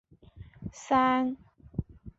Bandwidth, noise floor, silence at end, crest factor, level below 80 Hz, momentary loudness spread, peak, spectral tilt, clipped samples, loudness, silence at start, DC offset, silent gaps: 8 kHz; -51 dBFS; 0.1 s; 18 dB; -52 dBFS; 20 LU; -12 dBFS; -6 dB/octave; under 0.1%; -29 LUFS; 0.35 s; under 0.1%; none